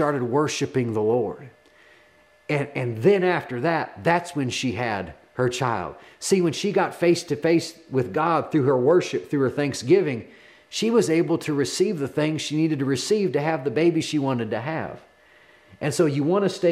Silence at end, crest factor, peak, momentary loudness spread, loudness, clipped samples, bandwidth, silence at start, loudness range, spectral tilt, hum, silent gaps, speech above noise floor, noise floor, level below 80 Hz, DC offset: 0 s; 18 dB; -6 dBFS; 8 LU; -23 LUFS; under 0.1%; 14.5 kHz; 0 s; 3 LU; -5.5 dB/octave; none; none; 34 dB; -56 dBFS; -66 dBFS; under 0.1%